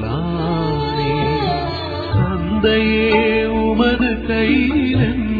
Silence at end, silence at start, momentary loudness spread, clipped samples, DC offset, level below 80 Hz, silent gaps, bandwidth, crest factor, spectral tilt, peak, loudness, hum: 0 s; 0 s; 6 LU; under 0.1%; under 0.1%; -30 dBFS; none; 4.9 kHz; 14 dB; -9 dB/octave; -2 dBFS; -17 LUFS; none